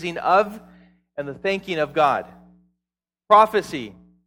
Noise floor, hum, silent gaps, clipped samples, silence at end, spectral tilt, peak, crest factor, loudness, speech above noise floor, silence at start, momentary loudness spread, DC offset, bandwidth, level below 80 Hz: -88 dBFS; none; none; under 0.1%; 0.35 s; -5 dB/octave; -2 dBFS; 22 dB; -20 LUFS; 68 dB; 0 s; 18 LU; under 0.1%; 17 kHz; -60 dBFS